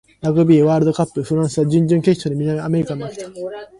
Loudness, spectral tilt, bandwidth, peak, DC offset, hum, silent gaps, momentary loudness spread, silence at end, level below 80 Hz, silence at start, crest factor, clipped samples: -17 LUFS; -8 dB/octave; 11.5 kHz; -2 dBFS; under 0.1%; none; none; 16 LU; 0.15 s; -52 dBFS; 0.25 s; 16 dB; under 0.1%